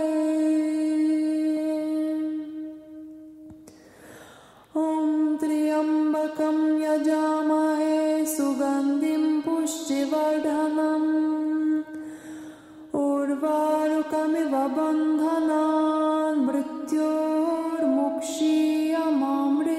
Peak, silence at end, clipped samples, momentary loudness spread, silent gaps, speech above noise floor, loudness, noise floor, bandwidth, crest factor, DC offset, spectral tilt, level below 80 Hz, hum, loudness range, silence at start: -12 dBFS; 0 s; under 0.1%; 8 LU; none; 26 dB; -24 LUFS; -50 dBFS; 14 kHz; 12 dB; under 0.1%; -4 dB/octave; -70 dBFS; none; 5 LU; 0 s